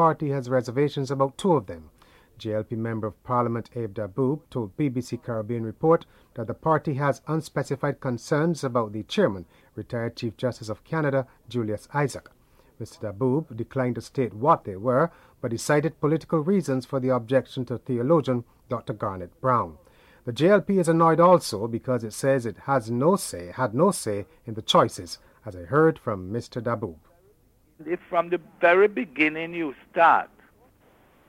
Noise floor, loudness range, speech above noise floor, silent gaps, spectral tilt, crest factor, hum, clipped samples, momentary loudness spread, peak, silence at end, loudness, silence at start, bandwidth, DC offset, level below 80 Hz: -61 dBFS; 6 LU; 36 dB; none; -6 dB/octave; 20 dB; none; under 0.1%; 14 LU; -6 dBFS; 1 s; -25 LUFS; 0 s; 15.5 kHz; under 0.1%; -60 dBFS